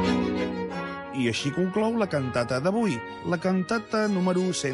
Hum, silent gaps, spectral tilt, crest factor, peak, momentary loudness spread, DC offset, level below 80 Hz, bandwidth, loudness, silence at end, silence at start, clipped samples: none; none; -5.5 dB/octave; 14 dB; -12 dBFS; 7 LU; under 0.1%; -52 dBFS; 11.5 kHz; -27 LUFS; 0 s; 0 s; under 0.1%